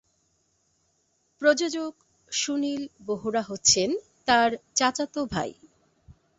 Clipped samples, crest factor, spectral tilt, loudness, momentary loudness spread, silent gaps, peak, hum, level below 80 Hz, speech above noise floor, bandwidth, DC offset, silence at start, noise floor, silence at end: under 0.1%; 22 dB; -2 dB/octave; -25 LUFS; 12 LU; none; -6 dBFS; none; -60 dBFS; 45 dB; 8.2 kHz; under 0.1%; 1.4 s; -71 dBFS; 0.3 s